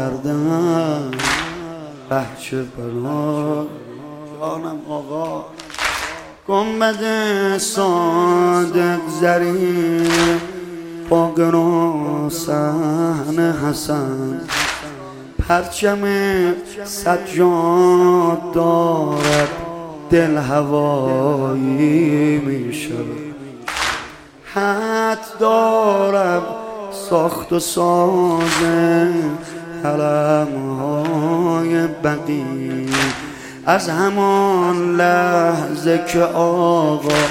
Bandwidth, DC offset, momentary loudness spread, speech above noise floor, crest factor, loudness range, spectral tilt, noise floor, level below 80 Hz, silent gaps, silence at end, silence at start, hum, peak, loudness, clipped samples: 16.5 kHz; under 0.1%; 13 LU; 20 dB; 16 dB; 6 LU; -5.5 dB/octave; -37 dBFS; -44 dBFS; none; 0 s; 0 s; none; 0 dBFS; -17 LUFS; under 0.1%